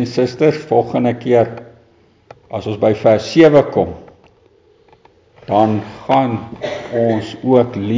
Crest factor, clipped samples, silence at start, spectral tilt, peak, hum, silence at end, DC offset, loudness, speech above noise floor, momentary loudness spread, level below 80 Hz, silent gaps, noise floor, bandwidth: 16 dB; under 0.1%; 0 s; -7.5 dB/octave; 0 dBFS; none; 0 s; under 0.1%; -15 LUFS; 37 dB; 14 LU; -48 dBFS; none; -51 dBFS; 7.6 kHz